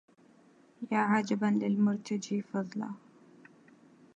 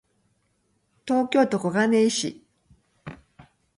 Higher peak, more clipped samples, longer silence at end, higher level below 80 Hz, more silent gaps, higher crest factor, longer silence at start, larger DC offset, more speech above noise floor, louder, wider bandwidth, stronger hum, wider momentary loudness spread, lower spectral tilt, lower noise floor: second, -14 dBFS vs -8 dBFS; neither; first, 1.2 s vs 0.6 s; second, -82 dBFS vs -64 dBFS; neither; about the same, 18 dB vs 18 dB; second, 0.8 s vs 1.05 s; neither; second, 31 dB vs 48 dB; second, -31 LUFS vs -23 LUFS; second, 8.2 kHz vs 11.5 kHz; neither; second, 13 LU vs 23 LU; first, -6.5 dB/octave vs -4.5 dB/octave; second, -62 dBFS vs -70 dBFS